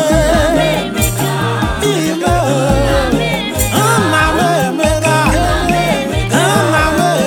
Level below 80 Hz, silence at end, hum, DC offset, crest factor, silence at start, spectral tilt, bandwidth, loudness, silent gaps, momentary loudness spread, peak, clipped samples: -24 dBFS; 0 s; none; under 0.1%; 12 dB; 0 s; -4.5 dB/octave; 19 kHz; -13 LUFS; none; 4 LU; 0 dBFS; under 0.1%